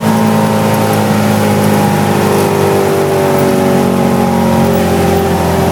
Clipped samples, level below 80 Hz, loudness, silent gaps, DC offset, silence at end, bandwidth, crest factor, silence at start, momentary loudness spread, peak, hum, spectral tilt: under 0.1%; -36 dBFS; -11 LUFS; none; under 0.1%; 0 s; 18 kHz; 10 dB; 0 s; 1 LU; 0 dBFS; none; -6 dB/octave